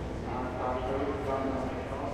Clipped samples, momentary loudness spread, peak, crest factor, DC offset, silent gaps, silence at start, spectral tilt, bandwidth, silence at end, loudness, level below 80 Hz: under 0.1%; 4 LU; -20 dBFS; 14 dB; under 0.1%; none; 0 s; -7 dB/octave; 13.5 kHz; 0 s; -33 LUFS; -44 dBFS